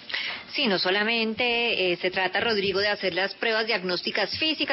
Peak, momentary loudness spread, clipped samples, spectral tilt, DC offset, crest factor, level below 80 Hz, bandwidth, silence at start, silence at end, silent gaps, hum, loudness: -12 dBFS; 4 LU; under 0.1%; -7 dB/octave; under 0.1%; 14 dB; -62 dBFS; 5.8 kHz; 0 s; 0 s; none; none; -24 LUFS